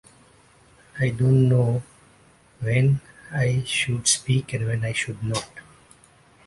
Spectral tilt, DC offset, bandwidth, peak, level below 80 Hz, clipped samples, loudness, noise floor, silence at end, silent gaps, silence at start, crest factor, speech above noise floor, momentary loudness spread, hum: -4.5 dB/octave; under 0.1%; 11.5 kHz; -6 dBFS; -52 dBFS; under 0.1%; -23 LUFS; -55 dBFS; 0.85 s; none; 0.95 s; 18 dB; 34 dB; 11 LU; none